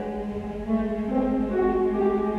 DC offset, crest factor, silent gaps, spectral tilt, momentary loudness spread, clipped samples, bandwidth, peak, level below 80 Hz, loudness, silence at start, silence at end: under 0.1%; 14 dB; none; -9 dB/octave; 8 LU; under 0.1%; 6.4 kHz; -12 dBFS; -42 dBFS; -25 LUFS; 0 s; 0 s